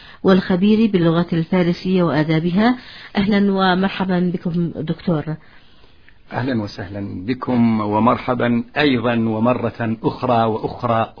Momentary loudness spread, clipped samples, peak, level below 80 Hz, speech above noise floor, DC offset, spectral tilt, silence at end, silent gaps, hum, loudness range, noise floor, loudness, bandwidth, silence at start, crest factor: 9 LU; under 0.1%; -2 dBFS; -46 dBFS; 32 dB; 0.5%; -9 dB/octave; 0.1 s; none; none; 6 LU; -49 dBFS; -18 LUFS; 5.4 kHz; 0 s; 16 dB